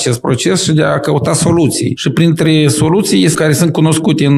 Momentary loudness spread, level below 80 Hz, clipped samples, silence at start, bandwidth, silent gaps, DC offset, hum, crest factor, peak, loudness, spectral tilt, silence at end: 3 LU; -44 dBFS; under 0.1%; 0 s; 14.5 kHz; none; under 0.1%; none; 10 dB; 0 dBFS; -11 LUFS; -5 dB/octave; 0 s